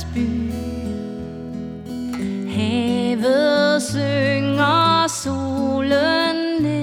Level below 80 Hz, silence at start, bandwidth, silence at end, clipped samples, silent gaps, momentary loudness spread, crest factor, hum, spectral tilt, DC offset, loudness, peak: -42 dBFS; 0 s; 16.5 kHz; 0 s; under 0.1%; none; 14 LU; 14 dB; none; -5 dB/octave; under 0.1%; -19 LUFS; -6 dBFS